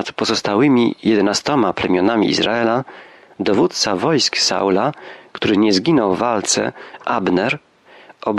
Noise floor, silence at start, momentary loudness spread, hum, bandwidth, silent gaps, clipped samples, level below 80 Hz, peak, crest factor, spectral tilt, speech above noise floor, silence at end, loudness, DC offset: -45 dBFS; 0 s; 9 LU; none; 12 kHz; none; under 0.1%; -56 dBFS; -4 dBFS; 14 dB; -4 dB/octave; 28 dB; 0 s; -17 LUFS; under 0.1%